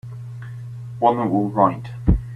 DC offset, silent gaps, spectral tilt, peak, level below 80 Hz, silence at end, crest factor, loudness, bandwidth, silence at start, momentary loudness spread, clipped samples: under 0.1%; none; -10 dB/octave; -2 dBFS; -30 dBFS; 0 s; 20 dB; -20 LUFS; 9.4 kHz; 0.05 s; 16 LU; under 0.1%